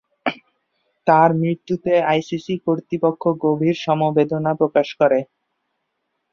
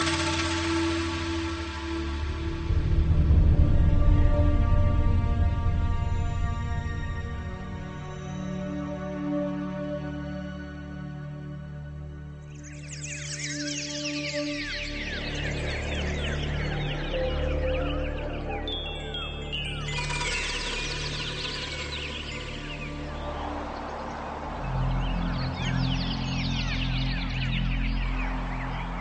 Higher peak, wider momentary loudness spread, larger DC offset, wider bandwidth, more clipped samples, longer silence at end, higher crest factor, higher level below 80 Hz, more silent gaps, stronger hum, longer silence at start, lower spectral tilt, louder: first, -2 dBFS vs -8 dBFS; second, 9 LU vs 12 LU; neither; second, 7.2 kHz vs 8.8 kHz; neither; first, 1.1 s vs 0 s; about the same, 18 dB vs 18 dB; second, -62 dBFS vs -30 dBFS; neither; neither; first, 0.25 s vs 0 s; first, -7.5 dB/octave vs -5 dB/octave; first, -19 LUFS vs -29 LUFS